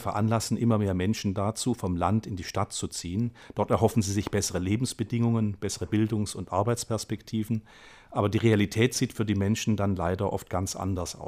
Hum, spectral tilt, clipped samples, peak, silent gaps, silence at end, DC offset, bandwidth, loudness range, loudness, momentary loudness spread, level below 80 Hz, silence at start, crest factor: none; -5.5 dB/octave; under 0.1%; -8 dBFS; none; 0 s; under 0.1%; 15.5 kHz; 2 LU; -28 LUFS; 7 LU; -52 dBFS; 0 s; 20 dB